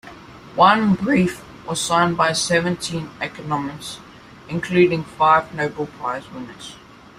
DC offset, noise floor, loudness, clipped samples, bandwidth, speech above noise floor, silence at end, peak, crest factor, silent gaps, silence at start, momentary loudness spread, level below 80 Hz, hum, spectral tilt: under 0.1%; -40 dBFS; -19 LUFS; under 0.1%; 15.5 kHz; 21 dB; 0.4 s; -2 dBFS; 20 dB; none; 0.05 s; 18 LU; -52 dBFS; none; -4.5 dB/octave